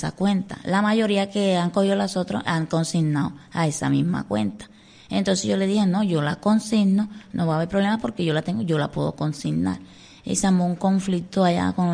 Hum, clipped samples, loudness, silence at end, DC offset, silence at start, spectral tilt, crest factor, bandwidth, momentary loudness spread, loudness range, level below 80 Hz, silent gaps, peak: none; under 0.1%; -23 LUFS; 0 s; under 0.1%; 0 s; -6 dB/octave; 16 dB; 10.5 kHz; 6 LU; 2 LU; -54 dBFS; none; -6 dBFS